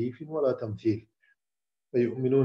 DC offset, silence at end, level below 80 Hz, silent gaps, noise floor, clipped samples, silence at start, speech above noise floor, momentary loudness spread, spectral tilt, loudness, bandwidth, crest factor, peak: under 0.1%; 0 s; -70 dBFS; none; under -90 dBFS; under 0.1%; 0 s; over 63 dB; 6 LU; -10 dB/octave; -30 LUFS; 6.4 kHz; 16 dB; -12 dBFS